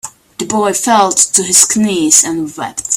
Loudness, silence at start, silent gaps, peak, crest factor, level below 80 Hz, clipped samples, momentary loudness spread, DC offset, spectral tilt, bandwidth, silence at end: -10 LUFS; 0.05 s; none; 0 dBFS; 12 dB; -54 dBFS; 0.4%; 13 LU; under 0.1%; -2 dB/octave; over 20 kHz; 0 s